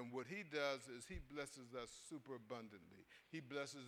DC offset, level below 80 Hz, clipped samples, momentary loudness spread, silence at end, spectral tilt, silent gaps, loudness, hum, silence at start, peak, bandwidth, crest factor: under 0.1%; -68 dBFS; under 0.1%; 14 LU; 0 s; -4 dB/octave; none; -50 LUFS; none; 0 s; -28 dBFS; 19 kHz; 24 dB